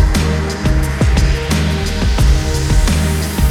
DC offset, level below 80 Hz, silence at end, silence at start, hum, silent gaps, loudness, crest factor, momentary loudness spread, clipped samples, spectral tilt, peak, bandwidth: under 0.1%; -16 dBFS; 0 s; 0 s; none; none; -15 LUFS; 12 dB; 3 LU; under 0.1%; -5.5 dB/octave; -2 dBFS; 17 kHz